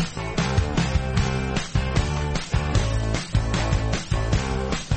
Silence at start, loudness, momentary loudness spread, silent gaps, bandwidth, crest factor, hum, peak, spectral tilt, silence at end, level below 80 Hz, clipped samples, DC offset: 0 s; -24 LUFS; 3 LU; none; 8.8 kHz; 14 dB; none; -8 dBFS; -5.5 dB/octave; 0 s; -28 dBFS; under 0.1%; under 0.1%